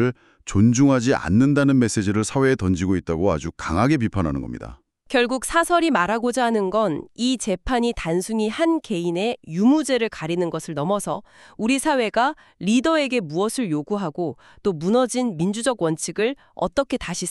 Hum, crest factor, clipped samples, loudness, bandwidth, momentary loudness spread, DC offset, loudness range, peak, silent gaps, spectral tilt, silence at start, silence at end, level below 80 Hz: none; 16 dB; under 0.1%; -21 LUFS; 13 kHz; 8 LU; under 0.1%; 3 LU; -4 dBFS; none; -5.5 dB/octave; 0 s; 0 s; -44 dBFS